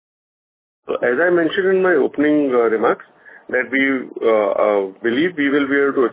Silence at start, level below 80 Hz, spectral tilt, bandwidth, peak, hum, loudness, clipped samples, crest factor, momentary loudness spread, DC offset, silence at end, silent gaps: 0.85 s; -64 dBFS; -9 dB/octave; 4 kHz; -4 dBFS; none; -17 LUFS; under 0.1%; 14 dB; 5 LU; under 0.1%; 0 s; none